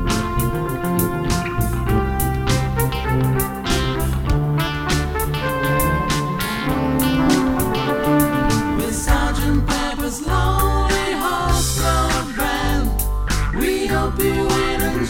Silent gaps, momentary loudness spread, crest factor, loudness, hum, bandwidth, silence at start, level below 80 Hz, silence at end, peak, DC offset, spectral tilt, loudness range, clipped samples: none; 4 LU; 16 dB; -19 LUFS; none; 18 kHz; 0 s; -24 dBFS; 0 s; -4 dBFS; under 0.1%; -5 dB/octave; 2 LU; under 0.1%